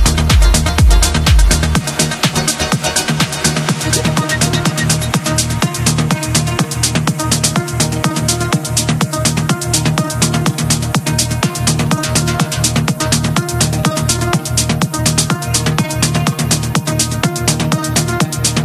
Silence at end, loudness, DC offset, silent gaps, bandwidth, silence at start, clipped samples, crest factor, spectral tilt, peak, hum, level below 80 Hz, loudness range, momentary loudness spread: 0 s; -14 LUFS; under 0.1%; none; 15.5 kHz; 0 s; under 0.1%; 14 dB; -4 dB/octave; 0 dBFS; none; -20 dBFS; 1 LU; 4 LU